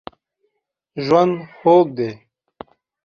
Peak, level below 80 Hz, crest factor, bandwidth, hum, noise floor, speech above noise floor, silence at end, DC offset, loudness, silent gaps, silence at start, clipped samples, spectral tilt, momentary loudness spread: -2 dBFS; -62 dBFS; 18 dB; 6.8 kHz; none; -74 dBFS; 58 dB; 0.9 s; under 0.1%; -17 LUFS; none; 0.95 s; under 0.1%; -7.5 dB/octave; 13 LU